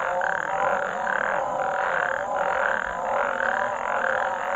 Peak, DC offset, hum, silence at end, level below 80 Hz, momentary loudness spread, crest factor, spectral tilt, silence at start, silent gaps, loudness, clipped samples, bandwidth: -8 dBFS; under 0.1%; none; 0 s; -56 dBFS; 2 LU; 18 dB; -3.5 dB/octave; 0 s; none; -25 LUFS; under 0.1%; 8.2 kHz